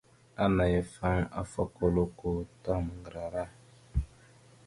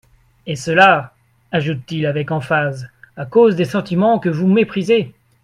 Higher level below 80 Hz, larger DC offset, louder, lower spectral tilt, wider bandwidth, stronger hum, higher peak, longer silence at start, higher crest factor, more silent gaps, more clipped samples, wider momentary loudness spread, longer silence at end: first, -42 dBFS vs -56 dBFS; neither; second, -32 LUFS vs -16 LUFS; about the same, -7.5 dB/octave vs -6.5 dB/octave; about the same, 11.5 kHz vs 12 kHz; neither; second, -14 dBFS vs 0 dBFS; about the same, 0.4 s vs 0.45 s; about the same, 18 dB vs 16 dB; neither; neither; second, 12 LU vs 19 LU; first, 0.6 s vs 0.35 s